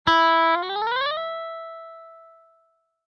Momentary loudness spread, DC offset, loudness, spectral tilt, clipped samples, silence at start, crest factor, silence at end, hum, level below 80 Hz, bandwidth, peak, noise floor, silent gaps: 21 LU; under 0.1%; -22 LUFS; -4 dB/octave; under 0.1%; 0.05 s; 18 dB; 0.9 s; none; -58 dBFS; 7 kHz; -8 dBFS; -66 dBFS; none